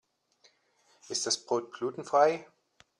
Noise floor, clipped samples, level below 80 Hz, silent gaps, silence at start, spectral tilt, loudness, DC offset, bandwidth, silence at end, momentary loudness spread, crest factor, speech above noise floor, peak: -68 dBFS; under 0.1%; -82 dBFS; none; 1.1 s; -2 dB/octave; -30 LUFS; under 0.1%; 12 kHz; 0.55 s; 11 LU; 22 dB; 39 dB; -12 dBFS